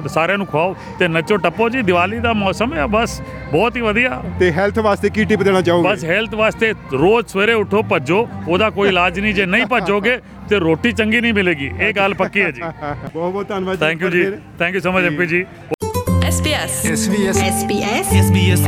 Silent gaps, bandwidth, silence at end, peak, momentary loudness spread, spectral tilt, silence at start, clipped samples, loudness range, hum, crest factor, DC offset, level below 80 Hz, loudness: 15.74-15.78 s; 16 kHz; 0 s; -2 dBFS; 7 LU; -5 dB/octave; 0 s; under 0.1%; 3 LU; none; 14 dB; under 0.1%; -40 dBFS; -16 LUFS